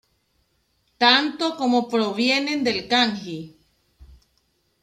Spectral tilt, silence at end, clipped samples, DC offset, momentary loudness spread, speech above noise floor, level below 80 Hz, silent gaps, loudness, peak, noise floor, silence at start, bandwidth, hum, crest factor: -3.5 dB/octave; 0.8 s; under 0.1%; under 0.1%; 11 LU; 47 dB; -60 dBFS; none; -20 LUFS; -4 dBFS; -68 dBFS; 1 s; 12.5 kHz; none; 20 dB